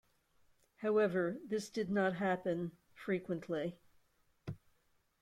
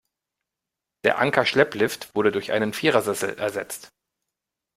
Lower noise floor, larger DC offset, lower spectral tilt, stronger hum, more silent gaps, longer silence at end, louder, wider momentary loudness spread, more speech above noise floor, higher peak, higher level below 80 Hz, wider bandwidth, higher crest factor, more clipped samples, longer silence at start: second, -76 dBFS vs -86 dBFS; neither; first, -6.5 dB/octave vs -4 dB/octave; neither; neither; second, 0.65 s vs 0.9 s; second, -37 LUFS vs -23 LUFS; first, 17 LU vs 8 LU; second, 39 dB vs 63 dB; second, -22 dBFS vs -2 dBFS; second, -74 dBFS vs -64 dBFS; second, 14 kHz vs 16 kHz; second, 16 dB vs 22 dB; neither; second, 0.8 s vs 1.05 s